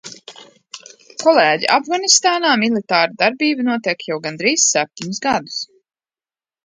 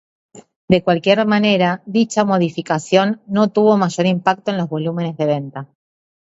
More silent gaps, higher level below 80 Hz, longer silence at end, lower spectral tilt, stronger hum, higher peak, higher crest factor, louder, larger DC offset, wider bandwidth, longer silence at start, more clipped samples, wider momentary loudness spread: second, none vs 0.56-0.68 s; second, -64 dBFS vs -56 dBFS; first, 1 s vs 0.65 s; second, -2 dB/octave vs -6 dB/octave; neither; about the same, 0 dBFS vs 0 dBFS; about the same, 18 dB vs 16 dB; about the same, -16 LUFS vs -17 LUFS; neither; first, 11 kHz vs 8 kHz; second, 0.05 s vs 0.35 s; neither; first, 22 LU vs 7 LU